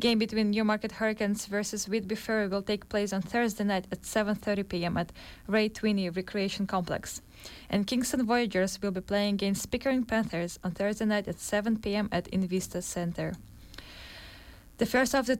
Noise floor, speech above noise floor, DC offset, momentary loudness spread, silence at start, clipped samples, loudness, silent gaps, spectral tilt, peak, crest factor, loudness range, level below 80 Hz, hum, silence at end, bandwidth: -50 dBFS; 21 dB; under 0.1%; 14 LU; 0 s; under 0.1%; -30 LUFS; none; -4.5 dB/octave; -14 dBFS; 16 dB; 3 LU; -54 dBFS; none; 0 s; 16.5 kHz